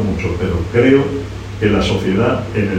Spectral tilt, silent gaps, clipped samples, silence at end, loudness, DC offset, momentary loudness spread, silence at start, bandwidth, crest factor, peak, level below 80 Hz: -7 dB/octave; none; under 0.1%; 0 s; -16 LUFS; under 0.1%; 9 LU; 0 s; 10 kHz; 16 dB; 0 dBFS; -32 dBFS